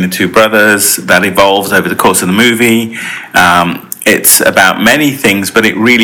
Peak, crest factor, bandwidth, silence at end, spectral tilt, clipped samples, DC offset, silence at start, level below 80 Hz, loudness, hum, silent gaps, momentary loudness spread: 0 dBFS; 8 dB; over 20 kHz; 0 s; -3 dB/octave; 2%; under 0.1%; 0 s; -42 dBFS; -7 LUFS; none; none; 7 LU